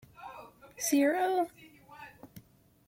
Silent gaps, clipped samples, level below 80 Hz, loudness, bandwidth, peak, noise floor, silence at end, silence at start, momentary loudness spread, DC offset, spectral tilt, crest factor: none; under 0.1%; -72 dBFS; -30 LUFS; 16.5 kHz; -16 dBFS; -57 dBFS; 0.5 s; 0.2 s; 24 LU; under 0.1%; -3 dB/octave; 18 dB